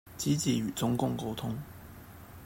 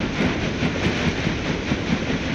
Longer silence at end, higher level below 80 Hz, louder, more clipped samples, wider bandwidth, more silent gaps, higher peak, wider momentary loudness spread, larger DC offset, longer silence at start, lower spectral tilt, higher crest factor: about the same, 0 s vs 0 s; second, -58 dBFS vs -36 dBFS; second, -32 LUFS vs -23 LUFS; neither; first, 16.5 kHz vs 9 kHz; neither; second, -16 dBFS vs -8 dBFS; first, 20 LU vs 2 LU; neither; about the same, 0.05 s vs 0 s; about the same, -5.5 dB/octave vs -5.5 dB/octave; about the same, 16 dB vs 14 dB